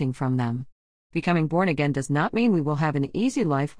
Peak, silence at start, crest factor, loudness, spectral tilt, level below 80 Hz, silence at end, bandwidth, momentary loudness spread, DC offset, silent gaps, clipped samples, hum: -8 dBFS; 0 s; 16 dB; -24 LUFS; -7 dB/octave; -56 dBFS; 0.05 s; 10.5 kHz; 7 LU; 0.3%; 0.72-1.10 s; under 0.1%; none